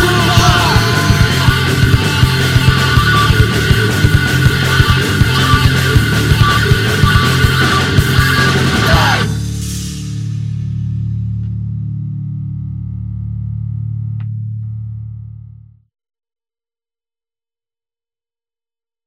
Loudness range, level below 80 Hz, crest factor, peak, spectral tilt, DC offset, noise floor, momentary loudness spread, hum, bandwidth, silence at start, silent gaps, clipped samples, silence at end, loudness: 14 LU; -24 dBFS; 14 dB; 0 dBFS; -5 dB/octave; under 0.1%; under -90 dBFS; 13 LU; none; 16.5 kHz; 0 s; none; 0.1%; 3.6 s; -12 LUFS